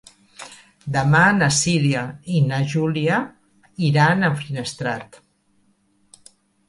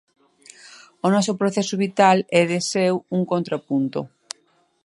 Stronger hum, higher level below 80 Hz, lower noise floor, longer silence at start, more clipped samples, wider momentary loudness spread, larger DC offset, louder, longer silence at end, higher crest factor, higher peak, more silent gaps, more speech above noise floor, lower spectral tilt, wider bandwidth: neither; first, -56 dBFS vs -70 dBFS; about the same, -62 dBFS vs -63 dBFS; second, 0.4 s vs 0.65 s; neither; first, 22 LU vs 16 LU; neither; about the same, -19 LUFS vs -21 LUFS; first, 1.65 s vs 0.8 s; about the same, 18 dB vs 20 dB; about the same, -4 dBFS vs -2 dBFS; neither; about the same, 43 dB vs 43 dB; about the same, -5 dB/octave vs -5 dB/octave; about the same, 11.5 kHz vs 11.5 kHz